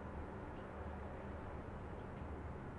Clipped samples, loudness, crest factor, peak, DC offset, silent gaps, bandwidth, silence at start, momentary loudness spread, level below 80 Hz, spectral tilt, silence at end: under 0.1%; -49 LUFS; 12 dB; -36 dBFS; under 0.1%; none; 11 kHz; 0 s; 1 LU; -54 dBFS; -8.5 dB/octave; 0 s